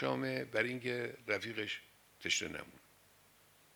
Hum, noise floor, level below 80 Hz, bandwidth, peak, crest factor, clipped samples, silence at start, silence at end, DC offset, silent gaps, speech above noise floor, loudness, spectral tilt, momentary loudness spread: none; -66 dBFS; -76 dBFS; over 20 kHz; -18 dBFS; 22 dB; under 0.1%; 0 s; 0.95 s; under 0.1%; none; 28 dB; -38 LUFS; -3 dB/octave; 9 LU